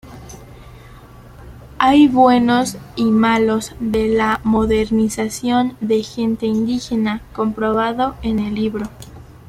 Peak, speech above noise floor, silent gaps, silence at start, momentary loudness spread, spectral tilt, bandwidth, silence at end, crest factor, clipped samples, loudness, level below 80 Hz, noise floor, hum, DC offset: -2 dBFS; 24 dB; none; 0.05 s; 10 LU; -5.5 dB/octave; 14 kHz; 0.2 s; 16 dB; under 0.1%; -17 LUFS; -40 dBFS; -40 dBFS; none; under 0.1%